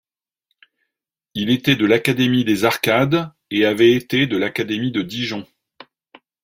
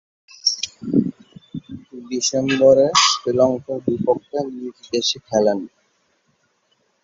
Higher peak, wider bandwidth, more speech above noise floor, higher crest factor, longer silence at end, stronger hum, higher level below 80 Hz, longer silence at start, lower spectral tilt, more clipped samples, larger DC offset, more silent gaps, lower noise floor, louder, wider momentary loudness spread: about the same, 0 dBFS vs -2 dBFS; first, 16.5 kHz vs 7.8 kHz; first, 64 dB vs 47 dB; about the same, 20 dB vs 20 dB; second, 1 s vs 1.35 s; neither; about the same, -58 dBFS vs -58 dBFS; first, 1.35 s vs 0.45 s; first, -5.5 dB/octave vs -3.5 dB/octave; neither; neither; neither; first, -82 dBFS vs -65 dBFS; about the same, -18 LUFS vs -19 LUFS; second, 10 LU vs 21 LU